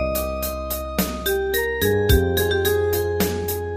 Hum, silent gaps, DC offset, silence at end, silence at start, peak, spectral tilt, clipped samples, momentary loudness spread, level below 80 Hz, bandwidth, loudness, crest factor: none; none; under 0.1%; 0 s; 0 s; -4 dBFS; -4.5 dB/octave; under 0.1%; 7 LU; -30 dBFS; 15.5 kHz; -21 LUFS; 18 dB